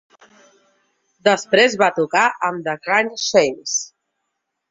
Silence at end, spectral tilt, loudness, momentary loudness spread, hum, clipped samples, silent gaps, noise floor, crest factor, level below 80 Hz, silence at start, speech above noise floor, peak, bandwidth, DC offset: 0.85 s; -2.5 dB/octave; -18 LUFS; 8 LU; none; under 0.1%; none; -76 dBFS; 20 dB; -64 dBFS; 1.25 s; 59 dB; 0 dBFS; 7.8 kHz; under 0.1%